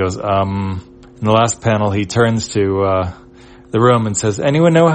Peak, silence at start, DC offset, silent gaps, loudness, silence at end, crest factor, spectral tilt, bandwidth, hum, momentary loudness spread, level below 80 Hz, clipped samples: 0 dBFS; 0 s; under 0.1%; none; -16 LUFS; 0 s; 14 dB; -5.5 dB/octave; 8.8 kHz; none; 9 LU; -46 dBFS; under 0.1%